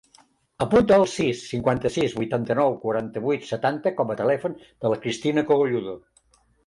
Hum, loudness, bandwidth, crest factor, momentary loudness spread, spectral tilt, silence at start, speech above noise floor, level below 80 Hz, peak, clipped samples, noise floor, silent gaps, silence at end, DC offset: none; -23 LUFS; 11.5 kHz; 16 dB; 9 LU; -6 dB/octave; 0.6 s; 39 dB; -52 dBFS; -8 dBFS; under 0.1%; -61 dBFS; none; 0.7 s; under 0.1%